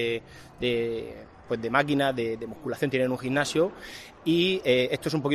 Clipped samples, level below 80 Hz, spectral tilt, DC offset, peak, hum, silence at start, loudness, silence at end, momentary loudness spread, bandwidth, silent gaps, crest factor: under 0.1%; -58 dBFS; -5 dB/octave; under 0.1%; -6 dBFS; none; 0 s; -27 LUFS; 0 s; 11 LU; 13.5 kHz; none; 20 dB